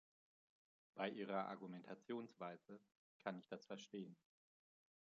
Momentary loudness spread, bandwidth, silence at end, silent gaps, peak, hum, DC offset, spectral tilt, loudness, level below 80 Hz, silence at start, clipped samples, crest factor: 14 LU; 7.4 kHz; 0.9 s; 2.97-3.20 s; -28 dBFS; none; under 0.1%; -4 dB/octave; -51 LUFS; under -90 dBFS; 0.95 s; under 0.1%; 24 dB